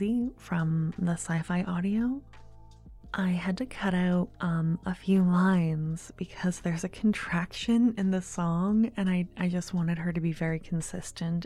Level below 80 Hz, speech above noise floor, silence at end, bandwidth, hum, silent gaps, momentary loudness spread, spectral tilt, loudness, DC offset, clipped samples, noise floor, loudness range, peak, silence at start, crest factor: -52 dBFS; 21 dB; 0 s; 11.5 kHz; none; none; 8 LU; -6.5 dB/octave; -29 LUFS; under 0.1%; under 0.1%; -50 dBFS; 3 LU; -12 dBFS; 0 s; 16 dB